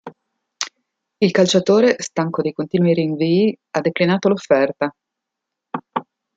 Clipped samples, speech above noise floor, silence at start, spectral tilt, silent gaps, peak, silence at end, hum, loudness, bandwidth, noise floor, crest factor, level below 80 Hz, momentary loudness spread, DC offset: under 0.1%; 65 dB; 0.05 s; -5.5 dB/octave; none; 0 dBFS; 0.35 s; none; -18 LUFS; 9 kHz; -82 dBFS; 20 dB; -64 dBFS; 14 LU; under 0.1%